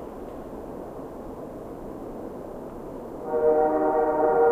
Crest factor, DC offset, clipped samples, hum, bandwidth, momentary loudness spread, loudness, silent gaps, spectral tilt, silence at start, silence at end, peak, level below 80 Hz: 18 dB; under 0.1%; under 0.1%; none; 15 kHz; 17 LU; -25 LUFS; none; -8 dB/octave; 0 s; 0 s; -10 dBFS; -50 dBFS